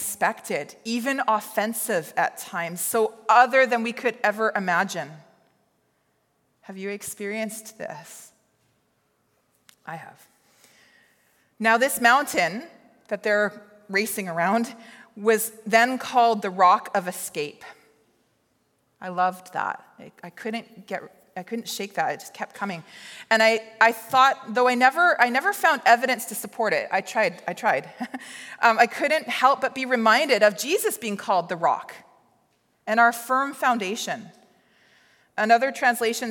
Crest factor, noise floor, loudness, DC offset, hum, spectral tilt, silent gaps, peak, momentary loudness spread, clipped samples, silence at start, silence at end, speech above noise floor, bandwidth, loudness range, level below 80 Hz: 22 dB; -69 dBFS; -22 LUFS; under 0.1%; none; -3 dB/octave; none; -4 dBFS; 17 LU; under 0.1%; 0 s; 0 s; 46 dB; 17.5 kHz; 12 LU; -80 dBFS